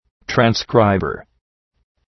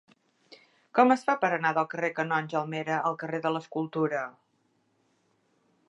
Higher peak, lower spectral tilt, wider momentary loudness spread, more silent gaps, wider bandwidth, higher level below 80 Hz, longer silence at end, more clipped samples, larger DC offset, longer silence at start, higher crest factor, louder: first, 0 dBFS vs -8 dBFS; about the same, -6 dB/octave vs -6.5 dB/octave; about the same, 11 LU vs 9 LU; neither; second, 6.2 kHz vs 11 kHz; first, -46 dBFS vs -84 dBFS; second, 0.9 s vs 1.6 s; neither; neither; second, 0.3 s vs 0.5 s; about the same, 20 dB vs 22 dB; first, -17 LUFS vs -28 LUFS